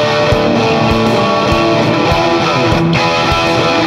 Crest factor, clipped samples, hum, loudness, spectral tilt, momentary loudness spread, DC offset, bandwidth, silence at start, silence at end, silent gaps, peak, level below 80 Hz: 10 dB; under 0.1%; none; -11 LUFS; -5.5 dB/octave; 0 LU; under 0.1%; 15.5 kHz; 0 s; 0 s; none; 0 dBFS; -30 dBFS